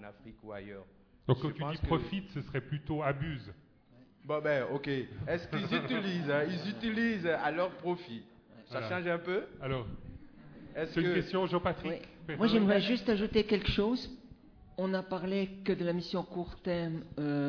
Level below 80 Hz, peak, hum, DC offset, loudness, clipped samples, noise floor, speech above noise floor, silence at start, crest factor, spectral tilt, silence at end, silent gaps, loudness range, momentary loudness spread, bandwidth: -54 dBFS; -14 dBFS; none; under 0.1%; -34 LUFS; under 0.1%; -61 dBFS; 28 dB; 0 s; 20 dB; -5 dB/octave; 0 s; none; 5 LU; 16 LU; 5.4 kHz